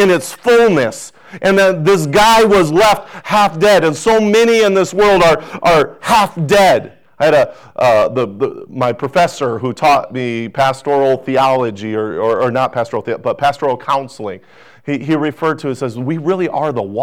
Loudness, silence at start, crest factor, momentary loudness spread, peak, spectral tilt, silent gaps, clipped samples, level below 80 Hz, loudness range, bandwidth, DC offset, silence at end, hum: -13 LUFS; 0 s; 8 dB; 10 LU; -4 dBFS; -5 dB/octave; none; under 0.1%; -44 dBFS; 7 LU; over 20 kHz; 0.4%; 0 s; none